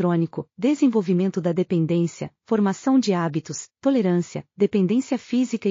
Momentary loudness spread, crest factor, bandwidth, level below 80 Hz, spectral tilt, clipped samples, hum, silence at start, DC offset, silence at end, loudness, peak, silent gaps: 7 LU; 14 dB; 7.4 kHz; -70 dBFS; -7.5 dB/octave; under 0.1%; none; 0 s; under 0.1%; 0 s; -22 LUFS; -8 dBFS; none